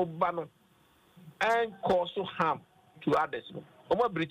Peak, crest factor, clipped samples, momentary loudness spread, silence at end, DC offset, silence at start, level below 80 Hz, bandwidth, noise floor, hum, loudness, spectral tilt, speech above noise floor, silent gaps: -16 dBFS; 16 dB; under 0.1%; 12 LU; 0 s; under 0.1%; 0 s; -66 dBFS; 15 kHz; -65 dBFS; none; -31 LUFS; -6 dB/octave; 34 dB; none